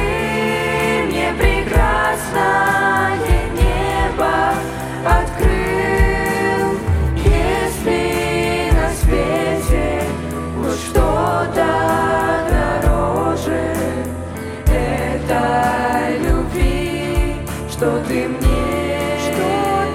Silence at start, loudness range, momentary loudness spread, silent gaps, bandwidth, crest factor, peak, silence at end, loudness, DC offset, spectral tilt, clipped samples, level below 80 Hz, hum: 0 s; 2 LU; 5 LU; none; 16 kHz; 16 dB; -2 dBFS; 0 s; -17 LUFS; under 0.1%; -5.5 dB/octave; under 0.1%; -22 dBFS; none